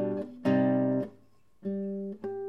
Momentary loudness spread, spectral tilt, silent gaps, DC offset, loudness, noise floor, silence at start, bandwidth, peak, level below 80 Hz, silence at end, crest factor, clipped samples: 12 LU; -9.5 dB/octave; none; 0.1%; -30 LUFS; -63 dBFS; 0 s; 5.8 kHz; -14 dBFS; -74 dBFS; 0 s; 16 dB; under 0.1%